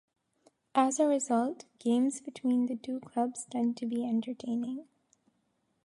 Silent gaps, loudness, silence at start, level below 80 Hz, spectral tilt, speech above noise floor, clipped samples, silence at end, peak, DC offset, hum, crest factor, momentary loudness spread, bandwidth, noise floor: none; -31 LUFS; 0.75 s; -82 dBFS; -4.5 dB/octave; 46 dB; under 0.1%; 1.05 s; -12 dBFS; under 0.1%; none; 20 dB; 9 LU; 11.5 kHz; -76 dBFS